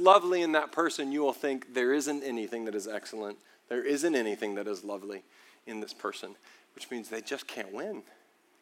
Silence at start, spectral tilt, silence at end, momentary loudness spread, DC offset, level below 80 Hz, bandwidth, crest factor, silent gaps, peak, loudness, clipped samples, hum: 0 s; -3 dB/octave; 0.6 s; 16 LU; under 0.1%; under -90 dBFS; 16.5 kHz; 24 dB; none; -6 dBFS; -32 LUFS; under 0.1%; none